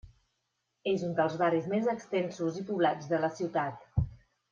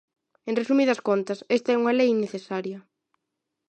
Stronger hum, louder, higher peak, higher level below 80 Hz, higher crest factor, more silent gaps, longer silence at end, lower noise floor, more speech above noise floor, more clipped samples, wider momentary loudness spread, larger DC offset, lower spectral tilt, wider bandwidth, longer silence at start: neither; second, -31 LUFS vs -24 LUFS; second, -14 dBFS vs -10 dBFS; first, -52 dBFS vs -80 dBFS; about the same, 18 dB vs 16 dB; neither; second, 0.35 s vs 0.9 s; about the same, -81 dBFS vs -82 dBFS; second, 51 dB vs 59 dB; neither; second, 6 LU vs 12 LU; neither; first, -7 dB/octave vs -5.5 dB/octave; second, 7.4 kHz vs 9 kHz; second, 0.05 s vs 0.45 s